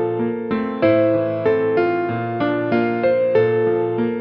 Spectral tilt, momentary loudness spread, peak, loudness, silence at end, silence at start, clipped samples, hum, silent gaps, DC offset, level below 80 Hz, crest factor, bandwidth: -6 dB/octave; 6 LU; -4 dBFS; -19 LUFS; 0 s; 0 s; under 0.1%; none; none; under 0.1%; -56 dBFS; 14 dB; 5.4 kHz